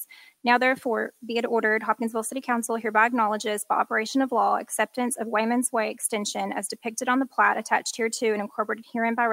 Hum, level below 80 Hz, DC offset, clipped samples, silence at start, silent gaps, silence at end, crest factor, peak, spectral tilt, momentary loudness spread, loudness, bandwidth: none; -82 dBFS; under 0.1%; under 0.1%; 0 s; none; 0 s; 20 dB; -6 dBFS; -2.5 dB/octave; 8 LU; -25 LUFS; 16 kHz